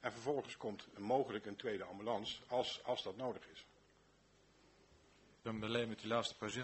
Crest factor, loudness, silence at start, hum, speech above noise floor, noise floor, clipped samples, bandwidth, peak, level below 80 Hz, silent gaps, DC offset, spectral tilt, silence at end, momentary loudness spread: 22 dB; -42 LUFS; 0 s; 50 Hz at -75 dBFS; 29 dB; -71 dBFS; under 0.1%; 8.2 kHz; -22 dBFS; -76 dBFS; none; under 0.1%; -4.5 dB/octave; 0 s; 9 LU